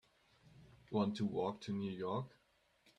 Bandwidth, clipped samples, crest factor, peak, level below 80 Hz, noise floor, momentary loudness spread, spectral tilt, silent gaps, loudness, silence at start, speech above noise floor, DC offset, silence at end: 9.4 kHz; under 0.1%; 20 dB; -22 dBFS; -76 dBFS; -75 dBFS; 6 LU; -7.5 dB/octave; none; -41 LUFS; 0.55 s; 36 dB; under 0.1%; 0.7 s